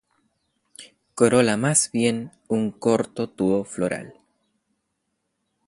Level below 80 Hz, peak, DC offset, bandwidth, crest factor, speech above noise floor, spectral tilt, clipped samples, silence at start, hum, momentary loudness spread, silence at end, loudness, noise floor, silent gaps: -60 dBFS; -4 dBFS; under 0.1%; 11.5 kHz; 20 dB; 54 dB; -4.5 dB/octave; under 0.1%; 0.8 s; none; 11 LU; 1.55 s; -22 LUFS; -76 dBFS; none